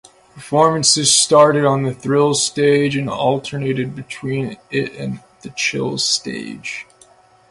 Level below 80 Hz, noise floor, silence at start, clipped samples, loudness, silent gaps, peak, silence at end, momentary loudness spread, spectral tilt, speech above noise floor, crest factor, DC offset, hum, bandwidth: -56 dBFS; -50 dBFS; 0.35 s; under 0.1%; -16 LUFS; none; 0 dBFS; 0.7 s; 16 LU; -3.5 dB/octave; 33 dB; 18 dB; under 0.1%; none; 11.5 kHz